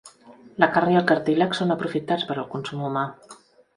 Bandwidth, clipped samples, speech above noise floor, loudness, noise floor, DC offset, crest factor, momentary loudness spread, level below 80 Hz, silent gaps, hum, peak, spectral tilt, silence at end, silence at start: 11 kHz; under 0.1%; 26 dB; -23 LUFS; -49 dBFS; under 0.1%; 24 dB; 10 LU; -66 dBFS; none; none; 0 dBFS; -6.5 dB/octave; 0.45 s; 0.05 s